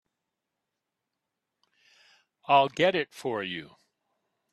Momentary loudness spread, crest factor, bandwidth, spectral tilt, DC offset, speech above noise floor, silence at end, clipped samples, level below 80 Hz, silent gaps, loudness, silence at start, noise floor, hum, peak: 15 LU; 22 dB; 12.5 kHz; -5 dB/octave; under 0.1%; 59 dB; 0.85 s; under 0.1%; -76 dBFS; none; -26 LUFS; 2.5 s; -85 dBFS; none; -10 dBFS